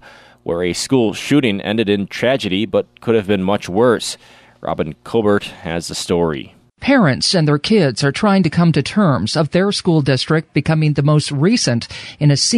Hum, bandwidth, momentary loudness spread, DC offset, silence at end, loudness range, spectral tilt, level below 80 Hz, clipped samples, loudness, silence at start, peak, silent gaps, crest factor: none; 13 kHz; 9 LU; under 0.1%; 0 s; 4 LU; -5.5 dB/octave; -48 dBFS; under 0.1%; -16 LUFS; 0.45 s; -4 dBFS; none; 12 dB